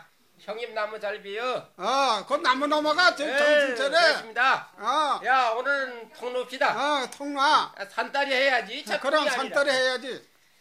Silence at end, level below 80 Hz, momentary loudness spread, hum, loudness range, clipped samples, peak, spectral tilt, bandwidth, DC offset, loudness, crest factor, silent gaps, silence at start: 0.4 s; -84 dBFS; 11 LU; none; 3 LU; under 0.1%; -6 dBFS; -1.5 dB/octave; 15 kHz; under 0.1%; -24 LUFS; 18 dB; none; 0.45 s